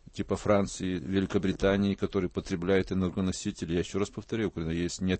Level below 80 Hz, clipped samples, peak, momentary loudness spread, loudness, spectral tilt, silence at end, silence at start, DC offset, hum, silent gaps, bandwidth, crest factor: -48 dBFS; under 0.1%; -12 dBFS; 6 LU; -30 LUFS; -6 dB/octave; 0 s; 0.15 s; under 0.1%; none; none; 8.8 kHz; 18 dB